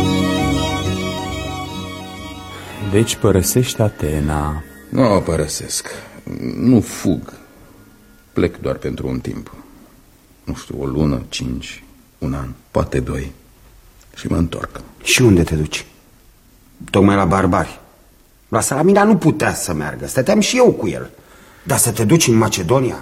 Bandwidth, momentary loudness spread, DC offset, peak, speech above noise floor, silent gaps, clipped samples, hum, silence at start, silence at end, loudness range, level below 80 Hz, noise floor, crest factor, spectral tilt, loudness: 16.5 kHz; 18 LU; under 0.1%; 0 dBFS; 33 dB; none; under 0.1%; none; 0 s; 0 s; 9 LU; -36 dBFS; -49 dBFS; 18 dB; -5 dB/octave; -17 LUFS